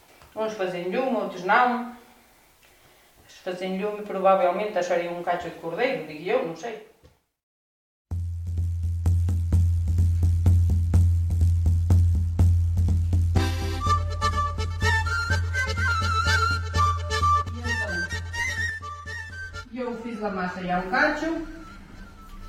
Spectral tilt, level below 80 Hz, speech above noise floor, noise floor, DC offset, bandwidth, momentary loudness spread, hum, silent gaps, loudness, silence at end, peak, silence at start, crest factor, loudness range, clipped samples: -6 dB/octave; -34 dBFS; 33 dB; -59 dBFS; under 0.1%; 10 kHz; 13 LU; none; 7.43-8.05 s; -25 LUFS; 0 s; -6 dBFS; 0.35 s; 18 dB; 7 LU; under 0.1%